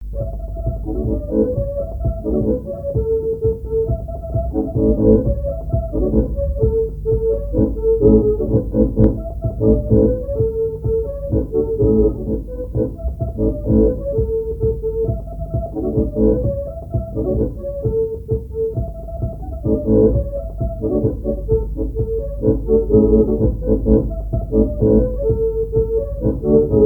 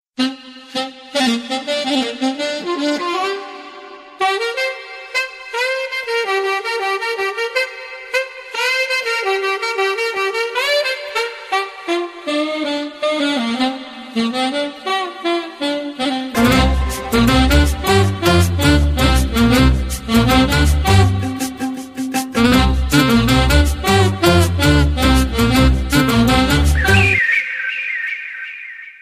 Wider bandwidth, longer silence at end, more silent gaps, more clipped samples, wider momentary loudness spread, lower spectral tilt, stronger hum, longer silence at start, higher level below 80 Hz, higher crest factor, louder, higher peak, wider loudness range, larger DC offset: second, 1.6 kHz vs 16 kHz; about the same, 0 s vs 0.1 s; neither; neither; about the same, 10 LU vs 10 LU; first, -13.5 dB/octave vs -5 dB/octave; neither; second, 0 s vs 0.2 s; about the same, -24 dBFS vs -24 dBFS; about the same, 18 dB vs 16 dB; second, -19 LUFS vs -16 LUFS; about the same, 0 dBFS vs 0 dBFS; about the same, 4 LU vs 6 LU; neither